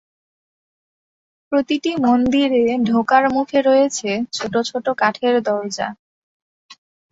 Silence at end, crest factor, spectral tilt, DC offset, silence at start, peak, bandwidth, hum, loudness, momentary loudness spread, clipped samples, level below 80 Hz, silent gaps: 0.4 s; 16 dB; -4 dB/octave; under 0.1%; 1.5 s; -2 dBFS; 8 kHz; none; -18 LUFS; 7 LU; under 0.1%; -56 dBFS; 5.99-6.69 s